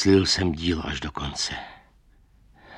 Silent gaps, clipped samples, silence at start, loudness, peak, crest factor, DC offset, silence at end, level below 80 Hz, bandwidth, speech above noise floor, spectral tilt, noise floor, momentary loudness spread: none; under 0.1%; 0 s; -25 LUFS; -6 dBFS; 20 dB; under 0.1%; 0 s; -42 dBFS; 11 kHz; 33 dB; -4.5 dB/octave; -57 dBFS; 14 LU